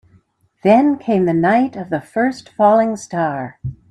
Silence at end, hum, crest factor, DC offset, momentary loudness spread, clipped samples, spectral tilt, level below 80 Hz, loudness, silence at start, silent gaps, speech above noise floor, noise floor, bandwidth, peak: 0.15 s; none; 16 dB; under 0.1%; 11 LU; under 0.1%; -7 dB/octave; -52 dBFS; -16 LUFS; 0.65 s; none; 39 dB; -55 dBFS; 11 kHz; 0 dBFS